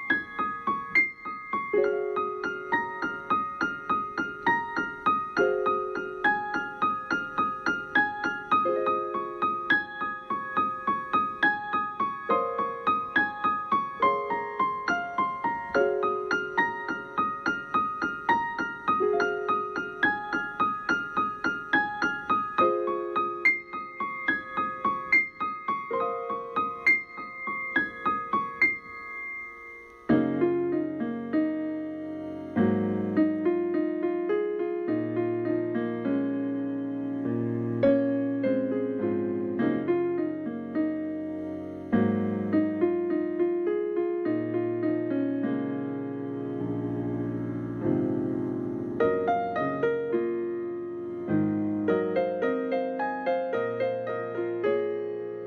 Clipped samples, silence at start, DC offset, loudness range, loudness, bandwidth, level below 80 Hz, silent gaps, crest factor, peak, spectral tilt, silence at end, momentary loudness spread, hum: under 0.1%; 0 s; under 0.1%; 2 LU; -28 LUFS; 6.8 kHz; -64 dBFS; none; 16 dB; -12 dBFS; -7 dB/octave; 0 s; 8 LU; none